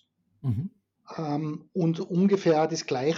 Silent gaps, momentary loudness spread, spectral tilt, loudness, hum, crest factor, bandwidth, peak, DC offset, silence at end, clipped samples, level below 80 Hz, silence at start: none; 13 LU; -6.5 dB/octave; -27 LUFS; none; 14 dB; 7.6 kHz; -12 dBFS; under 0.1%; 0 s; under 0.1%; -70 dBFS; 0.45 s